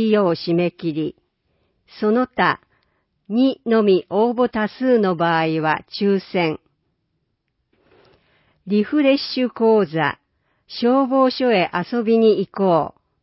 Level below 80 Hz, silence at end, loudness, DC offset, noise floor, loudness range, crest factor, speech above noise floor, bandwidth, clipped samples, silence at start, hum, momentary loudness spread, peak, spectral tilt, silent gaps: -62 dBFS; 0.35 s; -19 LUFS; under 0.1%; -72 dBFS; 5 LU; 16 dB; 54 dB; 5.8 kHz; under 0.1%; 0 s; none; 8 LU; -4 dBFS; -10.5 dB/octave; none